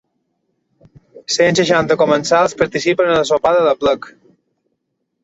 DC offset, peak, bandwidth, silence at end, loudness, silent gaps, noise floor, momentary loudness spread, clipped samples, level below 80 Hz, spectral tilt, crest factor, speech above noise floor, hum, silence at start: under 0.1%; -2 dBFS; 8 kHz; 1.15 s; -14 LUFS; none; -72 dBFS; 5 LU; under 0.1%; -52 dBFS; -4 dB/octave; 16 dB; 57 dB; none; 1.15 s